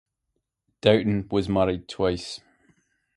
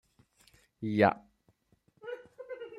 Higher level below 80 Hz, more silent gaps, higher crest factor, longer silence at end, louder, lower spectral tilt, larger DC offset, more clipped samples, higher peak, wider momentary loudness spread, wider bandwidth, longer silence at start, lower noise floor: first, -48 dBFS vs -74 dBFS; neither; about the same, 24 dB vs 26 dB; first, 0.8 s vs 0 s; first, -24 LUFS vs -29 LUFS; second, -6.5 dB/octave vs -8 dB/octave; neither; neither; first, -2 dBFS vs -10 dBFS; second, 13 LU vs 19 LU; about the same, 11.5 kHz vs 12 kHz; about the same, 0.85 s vs 0.8 s; first, -79 dBFS vs -71 dBFS